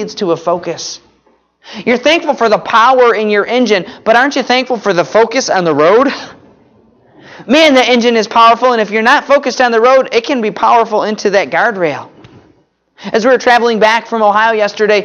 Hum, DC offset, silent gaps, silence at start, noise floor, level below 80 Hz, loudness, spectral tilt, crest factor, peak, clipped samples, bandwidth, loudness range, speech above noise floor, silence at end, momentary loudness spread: none; under 0.1%; none; 0 s; -53 dBFS; -56 dBFS; -10 LUFS; -3.5 dB/octave; 12 dB; 0 dBFS; under 0.1%; 10.5 kHz; 4 LU; 43 dB; 0 s; 9 LU